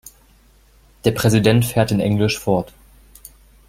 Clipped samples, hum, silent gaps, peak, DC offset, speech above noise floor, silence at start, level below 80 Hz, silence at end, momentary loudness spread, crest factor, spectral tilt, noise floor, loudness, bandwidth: under 0.1%; none; none; -2 dBFS; under 0.1%; 35 dB; 1.05 s; -44 dBFS; 1.05 s; 7 LU; 18 dB; -6 dB/octave; -52 dBFS; -18 LUFS; 16.5 kHz